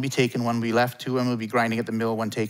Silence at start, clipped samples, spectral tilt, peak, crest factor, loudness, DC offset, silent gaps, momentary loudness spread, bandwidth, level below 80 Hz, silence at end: 0 s; under 0.1%; -5.5 dB/octave; -8 dBFS; 18 dB; -25 LUFS; under 0.1%; none; 3 LU; 16 kHz; -72 dBFS; 0 s